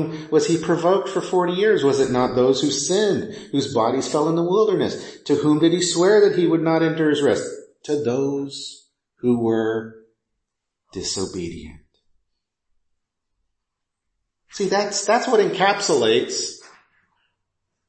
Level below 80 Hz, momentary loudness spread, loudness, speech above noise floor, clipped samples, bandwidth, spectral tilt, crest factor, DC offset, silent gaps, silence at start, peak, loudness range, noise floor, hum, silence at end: -58 dBFS; 12 LU; -20 LUFS; 61 dB; under 0.1%; 8.8 kHz; -4.5 dB/octave; 16 dB; under 0.1%; none; 0 s; -4 dBFS; 14 LU; -80 dBFS; none; 1.3 s